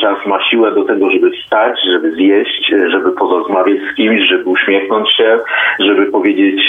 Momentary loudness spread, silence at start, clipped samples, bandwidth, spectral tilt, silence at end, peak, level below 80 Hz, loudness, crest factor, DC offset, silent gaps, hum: 3 LU; 0 s; under 0.1%; 3.9 kHz; -6 dB/octave; 0 s; 0 dBFS; -60 dBFS; -11 LUFS; 10 dB; under 0.1%; none; none